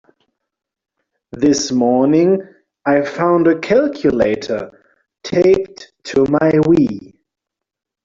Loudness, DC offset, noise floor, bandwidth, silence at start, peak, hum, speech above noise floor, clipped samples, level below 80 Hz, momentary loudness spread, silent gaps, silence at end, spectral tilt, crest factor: -15 LUFS; under 0.1%; -83 dBFS; 7.6 kHz; 1.35 s; -2 dBFS; none; 69 dB; under 0.1%; -50 dBFS; 11 LU; none; 1 s; -6 dB/octave; 14 dB